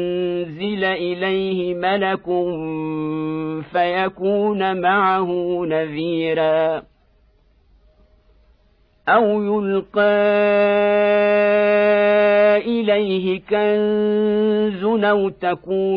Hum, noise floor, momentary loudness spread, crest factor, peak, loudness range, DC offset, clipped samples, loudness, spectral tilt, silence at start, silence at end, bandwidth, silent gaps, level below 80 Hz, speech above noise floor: none; -57 dBFS; 9 LU; 14 dB; -4 dBFS; 7 LU; under 0.1%; under 0.1%; -18 LUFS; -9 dB/octave; 0 s; 0 s; 5.2 kHz; none; -56 dBFS; 39 dB